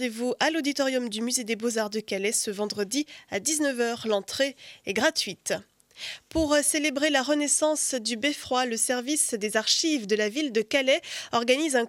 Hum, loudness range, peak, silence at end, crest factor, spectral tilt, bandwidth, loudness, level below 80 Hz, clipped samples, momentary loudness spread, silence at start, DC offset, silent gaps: none; 3 LU; -8 dBFS; 0 s; 18 dB; -1.5 dB/octave; 17 kHz; -26 LUFS; -58 dBFS; under 0.1%; 7 LU; 0 s; under 0.1%; none